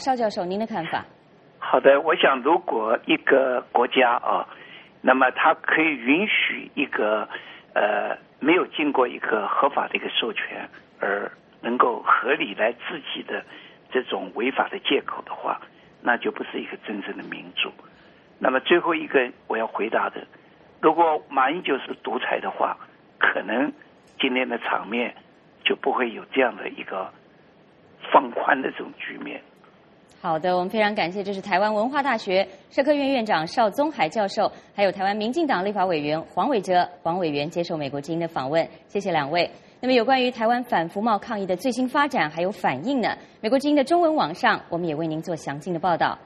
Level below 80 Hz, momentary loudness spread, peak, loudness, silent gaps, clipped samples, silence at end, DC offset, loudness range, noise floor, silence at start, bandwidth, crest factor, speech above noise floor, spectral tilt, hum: -70 dBFS; 12 LU; -2 dBFS; -23 LUFS; none; under 0.1%; 0.05 s; under 0.1%; 6 LU; -54 dBFS; 0 s; 11.5 kHz; 22 dB; 31 dB; -5 dB/octave; none